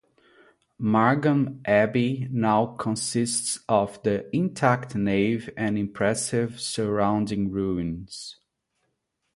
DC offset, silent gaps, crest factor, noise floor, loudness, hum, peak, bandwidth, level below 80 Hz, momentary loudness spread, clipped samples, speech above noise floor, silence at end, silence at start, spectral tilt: under 0.1%; none; 20 dB; -76 dBFS; -25 LUFS; none; -4 dBFS; 11.5 kHz; -54 dBFS; 7 LU; under 0.1%; 52 dB; 1.05 s; 0.8 s; -5 dB/octave